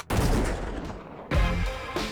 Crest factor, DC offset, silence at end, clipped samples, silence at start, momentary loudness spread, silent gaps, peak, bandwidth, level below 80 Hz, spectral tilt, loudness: 14 dB; under 0.1%; 0 s; under 0.1%; 0 s; 12 LU; none; -12 dBFS; 19.5 kHz; -30 dBFS; -5.5 dB/octave; -29 LUFS